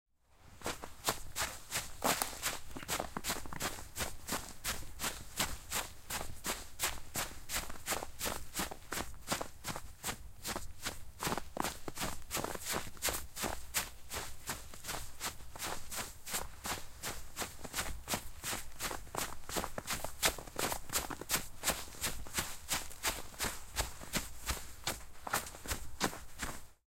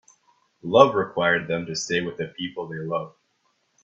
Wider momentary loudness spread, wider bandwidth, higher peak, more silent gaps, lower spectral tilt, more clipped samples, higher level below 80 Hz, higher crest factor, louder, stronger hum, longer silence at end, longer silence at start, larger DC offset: second, 7 LU vs 15 LU; first, 16.5 kHz vs 7.8 kHz; second, -10 dBFS vs 0 dBFS; neither; second, -2 dB/octave vs -4.5 dB/octave; neither; first, -50 dBFS vs -64 dBFS; first, 30 dB vs 24 dB; second, -39 LUFS vs -23 LUFS; neither; second, 0.15 s vs 0.75 s; second, 0.4 s vs 0.65 s; neither